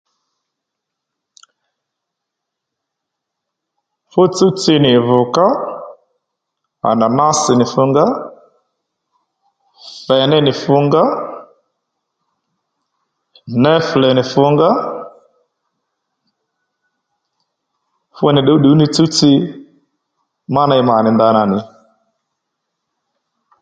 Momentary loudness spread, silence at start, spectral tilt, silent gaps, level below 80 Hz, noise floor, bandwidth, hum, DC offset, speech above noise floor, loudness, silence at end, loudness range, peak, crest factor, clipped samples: 14 LU; 4.15 s; -5.5 dB/octave; none; -56 dBFS; -79 dBFS; 9.2 kHz; none; under 0.1%; 67 dB; -13 LUFS; 1.95 s; 5 LU; 0 dBFS; 16 dB; under 0.1%